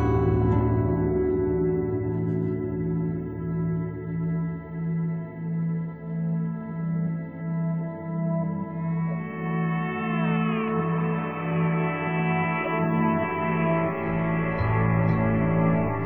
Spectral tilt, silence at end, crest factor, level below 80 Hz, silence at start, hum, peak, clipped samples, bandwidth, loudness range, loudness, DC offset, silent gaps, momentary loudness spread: -11 dB/octave; 0 s; 16 dB; -42 dBFS; 0 s; none; -10 dBFS; under 0.1%; 3.5 kHz; 5 LU; -26 LUFS; under 0.1%; none; 8 LU